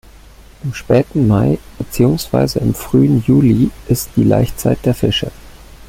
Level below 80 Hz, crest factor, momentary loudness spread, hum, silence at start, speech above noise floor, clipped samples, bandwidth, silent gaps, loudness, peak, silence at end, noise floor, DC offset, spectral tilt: -34 dBFS; 14 dB; 10 LU; none; 0.65 s; 26 dB; under 0.1%; 16.5 kHz; none; -14 LUFS; 0 dBFS; 0.05 s; -40 dBFS; under 0.1%; -6.5 dB/octave